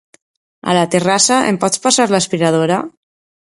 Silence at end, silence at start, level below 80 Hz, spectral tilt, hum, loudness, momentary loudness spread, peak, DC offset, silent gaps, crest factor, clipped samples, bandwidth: 0.55 s; 0.65 s; -58 dBFS; -3.5 dB/octave; none; -14 LUFS; 7 LU; 0 dBFS; under 0.1%; none; 16 dB; under 0.1%; 11.5 kHz